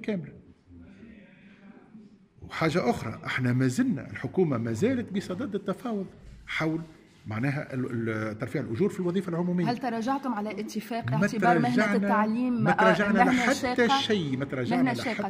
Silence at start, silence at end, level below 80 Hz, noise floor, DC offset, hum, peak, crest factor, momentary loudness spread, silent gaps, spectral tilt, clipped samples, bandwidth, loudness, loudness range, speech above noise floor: 0 s; 0 s; -60 dBFS; -52 dBFS; under 0.1%; none; -8 dBFS; 20 dB; 11 LU; none; -6 dB/octave; under 0.1%; 15.5 kHz; -27 LUFS; 8 LU; 26 dB